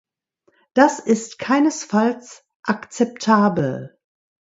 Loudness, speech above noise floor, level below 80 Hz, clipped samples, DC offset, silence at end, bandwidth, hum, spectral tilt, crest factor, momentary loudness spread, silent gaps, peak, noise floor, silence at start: -19 LUFS; 46 dB; -62 dBFS; under 0.1%; under 0.1%; 0.55 s; 8 kHz; none; -5.5 dB/octave; 20 dB; 9 LU; 2.55-2.63 s; 0 dBFS; -65 dBFS; 0.75 s